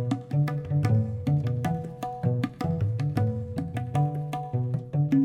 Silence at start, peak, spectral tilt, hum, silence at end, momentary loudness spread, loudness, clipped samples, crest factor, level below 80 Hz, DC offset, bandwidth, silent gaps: 0 s; -12 dBFS; -9 dB/octave; none; 0 s; 7 LU; -28 LUFS; under 0.1%; 16 dB; -54 dBFS; under 0.1%; 11.5 kHz; none